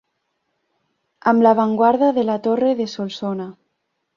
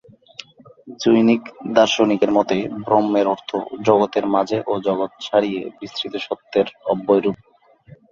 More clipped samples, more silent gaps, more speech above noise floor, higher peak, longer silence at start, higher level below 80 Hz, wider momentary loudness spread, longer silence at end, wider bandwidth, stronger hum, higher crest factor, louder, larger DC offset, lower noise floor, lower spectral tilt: neither; neither; first, 56 dB vs 29 dB; about the same, -2 dBFS vs 0 dBFS; first, 1.25 s vs 0.85 s; second, -66 dBFS vs -60 dBFS; about the same, 12 LU vs 12 LU; first, 0.65 s vs 0.15 s; about the same, 7.2 kHz vs 7.4 kHz; neither; about the same, 18 dB vs 20 dB; about the same, -18 LUFS vs -19 LUFS; neither; first, -73 dBFS vs -48 dBFS; first, -7 dB/octave vs -5.5 dB/octave